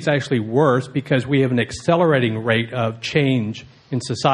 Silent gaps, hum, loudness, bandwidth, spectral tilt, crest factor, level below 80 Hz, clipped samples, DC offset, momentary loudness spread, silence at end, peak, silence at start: none; none; -19 LUFS; 10.5 kHz; -6.5 dB/octave; 18 dB; -52 dBFS; under 0.1%; under 0.1%; 8 LU; 0 s; -2 dBFS; 0 s